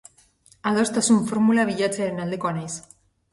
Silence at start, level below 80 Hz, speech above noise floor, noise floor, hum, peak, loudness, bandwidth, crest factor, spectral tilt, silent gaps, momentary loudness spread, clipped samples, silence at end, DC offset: 0.65 s; -62 dBFS; 35 dB; -57 dBFS; none; -6 dBFS; -22 LUFS; 11.5 kHz; 16 dB; -4.5 dB/octave; none; 11 LU; under 0.1%; 0.5 s; under 0.1%